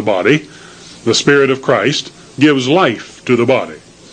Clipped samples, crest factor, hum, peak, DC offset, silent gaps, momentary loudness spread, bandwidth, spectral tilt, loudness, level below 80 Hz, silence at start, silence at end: under 0.1%; 14 dB; none; 0 dBFS; under 0.1%; none; 11 LU; 9.8 kHz; -4.5 dB/octave; -13 LUFS; -54 dBFS; 0 s; 0.35 s